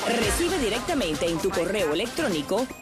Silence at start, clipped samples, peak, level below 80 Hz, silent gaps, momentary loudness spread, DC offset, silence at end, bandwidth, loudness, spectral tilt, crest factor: 0 s; under 0.1%; -10 dBFS; -42 dBFS; none; 3 LU; under 0.1%; 0 s; 14.5 kHz; -25 LUFS; -3.5 dB/octave; 16 dB